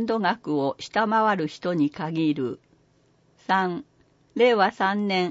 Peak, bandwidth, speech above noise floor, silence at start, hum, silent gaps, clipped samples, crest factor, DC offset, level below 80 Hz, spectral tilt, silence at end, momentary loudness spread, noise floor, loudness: -8 dBFS; 7.8 kHz; 39 dB; 0 s; none; none; under 0.1%; 18 dB; under 0.1%; -70 dBFS; -6 dB/octave; 0 s; 11 LU; -62 dBFS; -24 LUFS